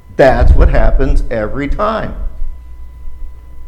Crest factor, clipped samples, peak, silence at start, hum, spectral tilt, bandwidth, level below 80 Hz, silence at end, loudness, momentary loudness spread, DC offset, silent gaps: 12 dB; 0.4%; 0 dBFS; 0.1 s; none; -8 dB/octave; 5.8 kHz; -14 dBFS; 0 s; -14 LUFS; 25 LU; under 0.1%; none